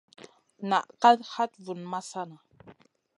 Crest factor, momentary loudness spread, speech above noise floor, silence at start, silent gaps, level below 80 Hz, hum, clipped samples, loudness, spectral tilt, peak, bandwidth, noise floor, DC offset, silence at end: 22 dB; 18 LU; 29 dB; 0.6 s; none; -80 dBFS; none; under 0.1%; -27 LUFS; -4.5 dB/octave; -6 dBFS; 11 kHz; -56 dBFS; under 0.1%; 0.85 s